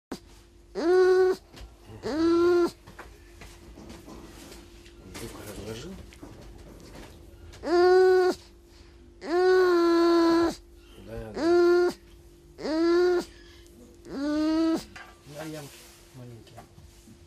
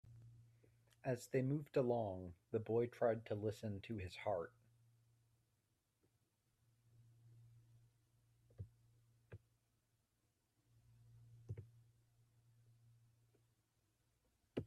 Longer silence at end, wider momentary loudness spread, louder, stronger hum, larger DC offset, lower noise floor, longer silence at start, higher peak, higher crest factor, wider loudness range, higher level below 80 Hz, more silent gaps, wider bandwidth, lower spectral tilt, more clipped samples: first, 0.65 s vs 0 s; about the same, 25 LU vs 24 LU; first, -24 LUFS vs -43 LUFS; neither; neither; second, -53 dBFS vs -85 dBFS; about the same, 0.1 s vs 0.05 s; first, -10 dBFS vs -26 dBFS; second, 16 dB vs 22 dB; second, 20 LU vs 24 LU; first, -52 dBFS vs -80 dBFS; neither; about the same, 14.5 kHz vs 13.5 kHz; second, -5.5 dB/octave vs -7.5 dB/octave; neither